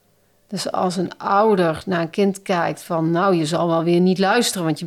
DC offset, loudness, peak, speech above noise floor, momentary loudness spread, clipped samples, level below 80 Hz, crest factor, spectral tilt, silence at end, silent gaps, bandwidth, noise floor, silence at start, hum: under 0.1%; -19 LUFS; -4 dBFS; 41 dB; 7 LU; under 0.1%; -60 dBFS; 14 dB; -5.5 dB/octave; 0 s; none; 14.5 kHz; -60 dBFS; 0.5 s; none